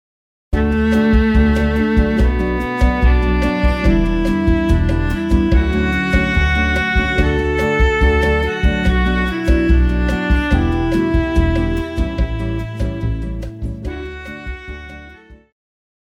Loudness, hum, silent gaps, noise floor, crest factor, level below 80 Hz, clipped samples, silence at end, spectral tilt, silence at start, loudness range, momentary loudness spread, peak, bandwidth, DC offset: -16 LUFS; none; none; -41 dBFS; 14 dB; -18 dBFS; under 0.1%; 0.7 s; -7.5 dB/octave; 0.5 s; 8 LU; 12 LU; -2 dBFS; 9.2 kHz; under 0.1%